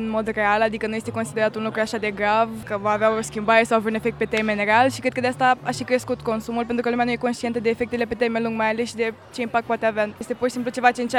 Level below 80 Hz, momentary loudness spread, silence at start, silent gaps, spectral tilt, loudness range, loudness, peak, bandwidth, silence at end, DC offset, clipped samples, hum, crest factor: -52 dBFS; 7 LU; 0 s; none; -4.5 dB/octave; 3 LU; -22 LUFS; -2 dBFS; 14 kHz; 0 s; under 0.1%; under 0.1%; none; 20 dB